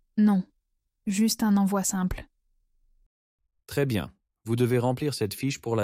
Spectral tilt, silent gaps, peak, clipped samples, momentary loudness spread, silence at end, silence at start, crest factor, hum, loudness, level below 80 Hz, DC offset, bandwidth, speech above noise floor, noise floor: -5.5 dB/octave; 3.06-3.38 s; -12 dBFS; under 0.1%; 14 LU; 0 s; 0.15 s; 16 dB; none; -26 LUFS; -50 dBFS; under 0.1%; 16 kHz; 51 dB; -76 dBFS